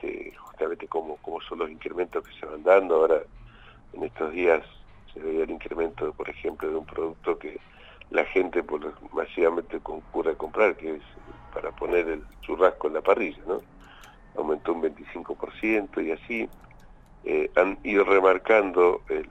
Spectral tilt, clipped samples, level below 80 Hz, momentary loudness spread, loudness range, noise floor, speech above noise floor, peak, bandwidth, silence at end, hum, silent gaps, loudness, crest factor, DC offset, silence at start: -6.5 dB/octave; under 0.1%; -52 dBFS; 15 LU; 5 LU; -50 dBFS; 24 dB; -6 dBFS; 8 kHz; 0 s; none; none; -26 LUFS; 20 dB; under 0.1%; 0 s